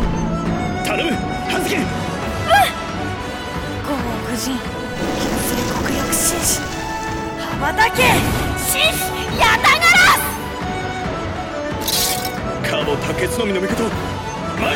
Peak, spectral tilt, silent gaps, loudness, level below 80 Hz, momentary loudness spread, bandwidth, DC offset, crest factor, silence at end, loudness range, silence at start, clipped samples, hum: -2 dBFS; -3.5 dB/octave; none; -18 LUFS; -34 dBFS; 12 LU; 17 kHz; under 0.1%; 16 dB; 0 s; 6 LU; 0 s; under 0.1%; none